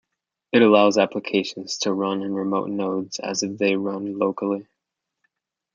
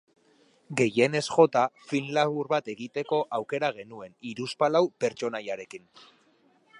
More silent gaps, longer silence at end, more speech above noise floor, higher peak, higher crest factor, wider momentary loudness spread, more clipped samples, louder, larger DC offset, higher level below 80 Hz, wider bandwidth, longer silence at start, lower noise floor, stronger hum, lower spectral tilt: neither; first, 1.15 s vs 1 s; first, 61 dB vs 37 dB; first, -2 dBFS vs -6 dBFS; about the same, 20 dB vs 22 dB; second, 11 LU vs 17 LU; neither; first, -22 LUFS vs -27 LUFS; neither; about the same, -72 dBFS vs -74 dBFS; second, 7.6 kHz vs 11 kHz; second, 0.55 s vs 0.7 s; first, -83 dBFS vs -64 dBFS; neither; about the same, -4.5 dB/octave vs -5 dB/octave